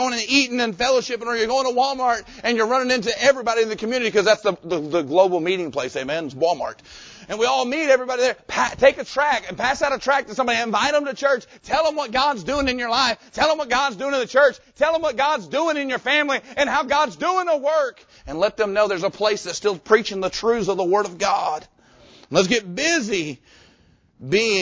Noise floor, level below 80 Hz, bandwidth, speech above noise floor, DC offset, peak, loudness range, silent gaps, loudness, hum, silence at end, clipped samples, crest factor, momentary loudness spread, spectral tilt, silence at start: -57 dBFS; -52 dBFS; 8 kHz; 36 dB; under 0.1%; -2 dBFS; 2 LU; none; -20 LUFS; none; 0 s; under 0.1%; 20 dB; 7 LU; -3 dB/octave; 0 s